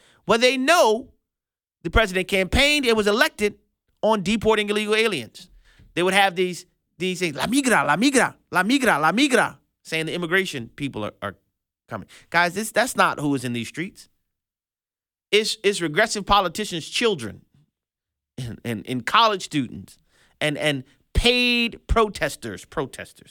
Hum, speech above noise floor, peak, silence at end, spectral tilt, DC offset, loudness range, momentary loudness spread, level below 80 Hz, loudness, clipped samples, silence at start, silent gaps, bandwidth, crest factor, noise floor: none; over 68 dB; -2 dBFS; 0.25 s; -3.5 dB/octave; under 0.1%; 4 LU; 15 LU; -38 dBFS; -21 LUFS; under 0.1%; 0.25 s; none; 19 kHz; 20 dB; under -90 dBFS